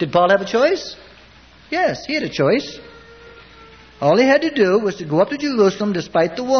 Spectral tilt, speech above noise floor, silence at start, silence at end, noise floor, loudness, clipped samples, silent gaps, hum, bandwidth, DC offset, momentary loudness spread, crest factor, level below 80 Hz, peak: -5.5 dB/octave; 29 dB; 0 s; 0 s; -46 dBFS; -17 LUFS; under 0.1%; none; none; 6.6 kHz; under 0.1%; 10 LU; 16 dB; -52 dBFS; -2 dBFS